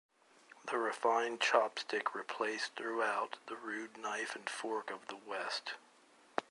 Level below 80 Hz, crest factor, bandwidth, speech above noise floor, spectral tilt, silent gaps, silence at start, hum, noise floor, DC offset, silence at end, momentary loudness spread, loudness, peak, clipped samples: -90 dBFS; 26 dB; 11.5 kHz; 28 dB; -1.5 dB/octave; none; 0.5 s; none; -65 dBFS; under 0.1%; 0.1 s; 12 LU; -38 LUFS; -14 dBFS; under 0.1%